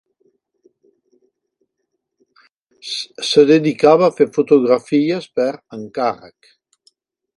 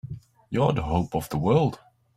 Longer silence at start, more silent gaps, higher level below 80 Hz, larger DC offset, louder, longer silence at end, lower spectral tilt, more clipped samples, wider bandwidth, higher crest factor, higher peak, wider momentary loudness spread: first, 2.85 s vs 0.05 s; neither; second, -66 dBFS vs -44 dBFS; neither; first, -15 LUFS vs -25 LUFS; first, 1.1 s vs 0.4 s; second, -5.5 dB/octave vs -7.5 dB/octave; neither; second, 11.5 kHz vs 16 kHz; about the same, 18 dB vs 18 dB; first, 0 dBFS vs -8 dBFS; about the same, 15 LU vs 13 LU